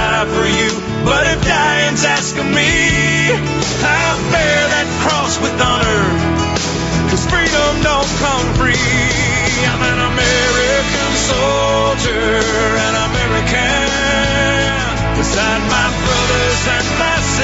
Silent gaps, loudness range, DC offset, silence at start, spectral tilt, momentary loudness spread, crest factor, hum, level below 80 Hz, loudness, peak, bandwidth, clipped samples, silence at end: none; 1 LU; under 0.1%; 0 s; -3.5 dB/octave; 3 LU; 12 dB; none; -26 dBFS; -13 LUFS; -2 dBFS; 8.2 kHz; under 0.1%; 0 s